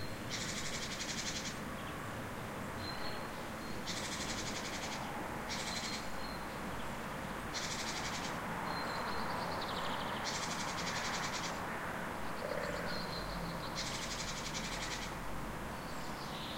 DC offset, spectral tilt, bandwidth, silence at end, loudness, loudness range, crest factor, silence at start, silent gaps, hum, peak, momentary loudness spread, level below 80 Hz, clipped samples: under 0.1%; -3 dB/octave; 16.5 kHz; 0 s; -40 LUFS; 3 LU; 14 dB; 0 s; none; none; -26 dBFS; 5 LU; -54 dBFS; under 0.1%